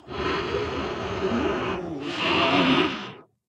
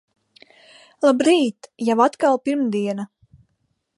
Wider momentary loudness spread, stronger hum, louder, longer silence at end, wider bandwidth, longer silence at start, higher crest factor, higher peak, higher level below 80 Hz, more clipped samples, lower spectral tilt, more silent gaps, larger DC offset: about the same, 11 LU vs 10 LU; neither; second, -25 LUFS vs -20 LUFS; second, 0.25 s vs 0.9 s; second, 9.8 kHz vs 11.5 kHz; second, 0.05 s vs 1 s; about the same, 18 dB vs 18 dB; second, -8 dBFS vs -4 dBFS; first, -48 dBFS vs -70 dBFS; neither; about the same, -5.5 dB/octave vs -5 dB/octave; neither; neither